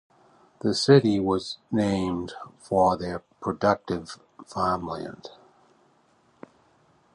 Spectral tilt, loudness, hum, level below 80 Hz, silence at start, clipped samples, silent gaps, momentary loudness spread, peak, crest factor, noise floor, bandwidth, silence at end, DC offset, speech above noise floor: -6 dB/octave; -25 LUFS; none; -54 dBFS; 0.65 s; under 0.1%; none; 21 LU; -4 dBFS; 22 dB; -63 dBFS; 11 kHz; 1.85 s; under 0.1%; 38 dB